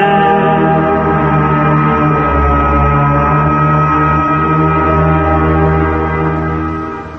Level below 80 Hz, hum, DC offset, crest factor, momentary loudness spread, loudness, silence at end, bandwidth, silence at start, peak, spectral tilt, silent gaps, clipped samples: -22 dBFS; none; under 0.1%; 10 dB; 4 LU; -11 LUFS; 0 s; 6 kHz; 0 s; 0 dBFS; -9.5 dB/octave; none; under 0.1%